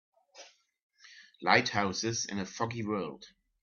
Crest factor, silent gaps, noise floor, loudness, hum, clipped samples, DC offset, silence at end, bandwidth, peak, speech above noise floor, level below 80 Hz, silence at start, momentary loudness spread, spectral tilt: 28 dB; 0.83-0.89 s; -57 dBFS; -31 LUFS; none; under 0.1%; under 0.1%; 0.35 s; 7.4 kHz; -6 dBFS; 25 dB; -72 dBFS; 0.35 s; 11 LU; -3.5 dB/octave